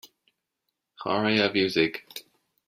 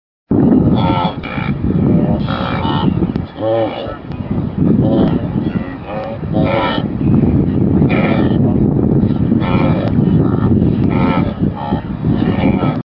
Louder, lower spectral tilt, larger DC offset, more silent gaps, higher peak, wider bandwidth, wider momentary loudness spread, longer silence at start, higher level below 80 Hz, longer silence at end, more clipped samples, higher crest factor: second, -24 LUFS vs -14 LUFS; second, -5 dB/octave vs -11.5 dB/octave; neither; neither; second, -8 dBFS vs 0 dBFS; first, 16 kHz vs 5.6 kHz; first, 18 LU vs 8 LU; first, 1 s vs 0.3 s; second, -66 dBFS vs -30 dBFS; first, 0.45 s vs 0 s; neither; first, 20 dB vs 14 dB